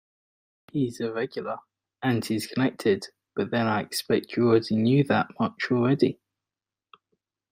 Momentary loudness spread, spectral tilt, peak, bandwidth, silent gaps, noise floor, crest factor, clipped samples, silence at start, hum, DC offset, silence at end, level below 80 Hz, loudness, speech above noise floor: 11 LU; -6.5 dB/octave; -8 dBFS; 15.5 kHz; none; under -90 dBFS; 18 dB; under 0.1%; 0.75 s; none; under 0.1%; 1.4 s; -66 dBFS; -26 LUFS; over 65 dB